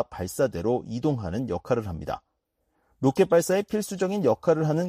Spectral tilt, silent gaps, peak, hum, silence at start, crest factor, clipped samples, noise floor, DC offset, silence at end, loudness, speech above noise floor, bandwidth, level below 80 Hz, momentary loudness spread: -6.5 dB/octave; none; -8 dBFS; none; 0 s; 16 dB; under 0.1%; -75 dBFS; under 0.1%; 0 s; -26 LUFS; 50 dB; 15 kHz; -52 dBFS; 10 LU